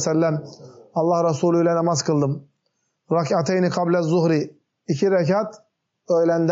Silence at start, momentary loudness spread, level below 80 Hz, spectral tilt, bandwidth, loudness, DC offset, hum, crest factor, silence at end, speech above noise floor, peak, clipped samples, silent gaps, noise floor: 0 s; 11 LU; -72 dBFS; -6.5 dB/octave; 8 kHz; -21 LUFS; under 0.1%; none; 12 dB; 0 s; 53 dB; -8 dBFS; under 0.1%; none; -73 dBFS